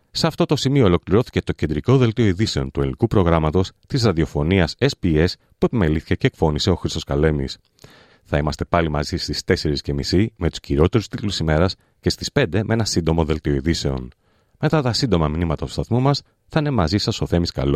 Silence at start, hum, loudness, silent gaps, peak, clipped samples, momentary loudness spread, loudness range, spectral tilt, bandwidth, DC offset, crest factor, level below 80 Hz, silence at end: 0.15 s; none; -20 LUFS; none; -2 dBFS; under 0.1%; 7 LU; 3 LU; -6 dB/octave; 14.5 kHz; under 0.1%; 18 dB; -36 dBFS; 0 s